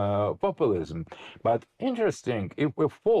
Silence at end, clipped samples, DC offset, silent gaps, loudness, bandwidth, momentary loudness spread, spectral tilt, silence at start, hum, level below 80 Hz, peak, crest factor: 0 s; under 0.1%; under 0.1%; none; -28 LUFS; 10.5 kHz; 6 LU; -7 dB/octave; 0 s; none; -58 dBFS; -16 dBFS; 12 dB